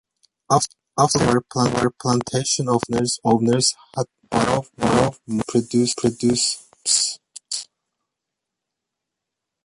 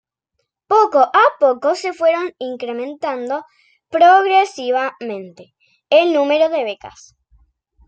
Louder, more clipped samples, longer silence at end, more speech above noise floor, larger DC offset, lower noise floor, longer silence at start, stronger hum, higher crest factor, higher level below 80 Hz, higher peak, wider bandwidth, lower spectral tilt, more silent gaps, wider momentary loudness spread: second, -20 LUFS vs -16 LUFS; neither; first, 2 s vs 1 s; first, 63 dB vs 57 dB; neither; first, -83 dBFS vs -73 dBFS; second, 0.5 s vs 0.7 s; neither; about the same, 20 dB vs 16 dB; first, -50 dBFS vs -64 dBFS; about the same, -2 dBFS vs -2 dBFS; first, 11.5 kHz vs 9 kHz; about the same, -4 dB/octave vs -3.5 dB/octave; neither; second, 10 LU vs 14 LU